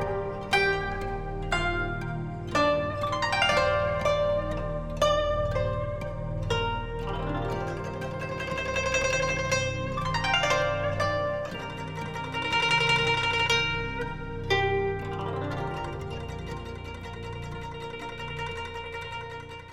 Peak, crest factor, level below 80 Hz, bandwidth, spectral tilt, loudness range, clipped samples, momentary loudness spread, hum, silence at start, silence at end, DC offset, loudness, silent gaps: -10 dBFS; 18 dB; -40 dBFS; 14 kHz; -4.5 dB/octave; 9 LU; under 0.1%; 13 LU; none; 0 s; 0 s; 0.2%; -28 LUFS; none